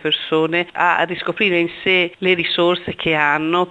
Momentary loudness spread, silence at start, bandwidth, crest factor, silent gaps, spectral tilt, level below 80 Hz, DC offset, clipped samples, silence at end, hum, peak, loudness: 3 LU; 0.05 s; 8 kHz; 16 dB; none; -6 dB/octave; -54 dBFS; under 0.1%; under 0.1%; 0 s; none; -2 dBFS; -17 LUFS